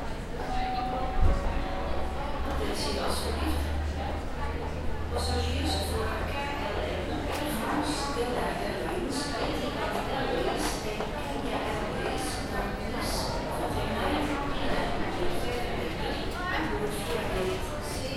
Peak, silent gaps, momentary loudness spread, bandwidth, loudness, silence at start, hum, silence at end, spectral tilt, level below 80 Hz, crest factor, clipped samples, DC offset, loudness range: -10 dBFS; none; 4 LU; 16 kHz; -31 LUFS; 0 s; none; 0 s; -5 dB/octave; -36 dBFS; 18 dB; under 0.1%; under 0.1%; 1 LU